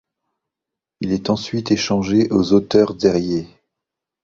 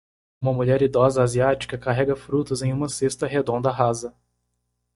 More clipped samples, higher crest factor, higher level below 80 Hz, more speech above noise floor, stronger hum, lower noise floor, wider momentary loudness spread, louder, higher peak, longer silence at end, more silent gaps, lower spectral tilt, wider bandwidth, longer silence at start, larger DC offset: neither; about the same, 18 dB vs 20 dB; about the same, -48 dBFS vs -50 dBFS; first, 68 dB vs 53 dB; second, none vs 60 Hz at -35 dBFS; first, -85 dBFS vs -75 dBFS; about the same, 9 LU vs 7 LU; first, -18 LUFS vs -22 LUFS; about the same, -2 dBFS vs -4 dBFS; about the same, 0.75 s vs 0.85 s; neither; about the same, -6 dB/octave vs -6 dB/octave; second, 7.6 kHz vs 11.5 kHz; first, 1 s vs 0.4 s; neither